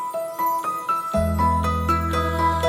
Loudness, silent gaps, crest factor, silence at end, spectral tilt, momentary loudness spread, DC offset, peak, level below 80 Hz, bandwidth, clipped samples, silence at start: -22 LUFS; none; 14 dB; 0 s; -6 dB/octave; 4 LU; under 0.1%; -8 dBFS; -36 dBFS; 17 kHz; under 0.1%; 0 s